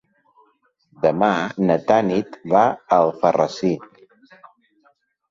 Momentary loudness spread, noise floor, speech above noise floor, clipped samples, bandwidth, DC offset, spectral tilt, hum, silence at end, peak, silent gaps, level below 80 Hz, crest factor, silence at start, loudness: 7 LU; -63 dBFS; 44 dB; under 0.1%; 7.6 kHz; under 0.1%; -6.5 dB/octave; none; 1.45 s; -2 dBFS; none; -62 dBFS; 18 dB; 1 s; -19 LUFS